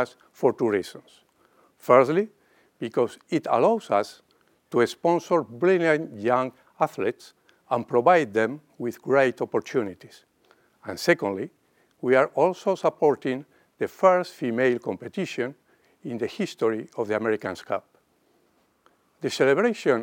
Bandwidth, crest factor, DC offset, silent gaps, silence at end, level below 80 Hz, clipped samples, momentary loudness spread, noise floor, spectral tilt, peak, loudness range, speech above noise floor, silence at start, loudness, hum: 17 kHz; 22 dB; under 0.1%; none; 0 s; -76 dBFS; under 0.1%; 13 LU; -66 dBFS; -6 dB/octave; -4 dBFS; 5 LU; 42 dB; 0 s; -24 LUFS; none